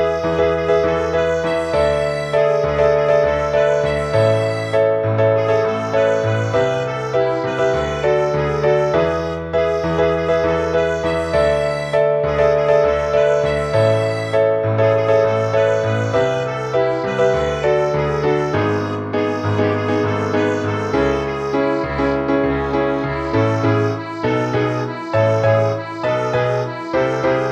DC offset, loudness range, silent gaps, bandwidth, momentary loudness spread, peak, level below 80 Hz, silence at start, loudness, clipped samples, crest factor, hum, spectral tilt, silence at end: under 0.1%; 2 LU; none; 11 kHz; 4 LU; -2 dBFS; -38 dBFS; 0 s; -17 LUFS; under 0.1%; 14 dB; none; -6.5 dB/octave; 0 s